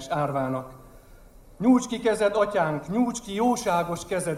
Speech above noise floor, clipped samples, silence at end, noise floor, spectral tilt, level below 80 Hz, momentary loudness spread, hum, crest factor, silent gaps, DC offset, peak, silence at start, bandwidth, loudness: 25 dB; under 0.1%; 0 s; -49 dBFS; -5.5 dB/octave; -52 dBFS; 7 LU; none; 16 dB; none; under 0.1%; -10 dBFS; 0 s; 15 kHz; -25 LUFS